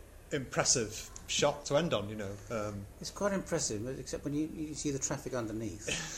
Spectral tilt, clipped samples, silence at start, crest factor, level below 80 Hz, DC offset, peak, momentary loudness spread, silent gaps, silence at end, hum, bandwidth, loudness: -3.5 dB/octave; under 0.1%; 0 s; 22 dB; -54 dBFS; under 0.1%; -14 dBFS; 10 LU; none; 0 s; none; 16 kHz; -34 LUFS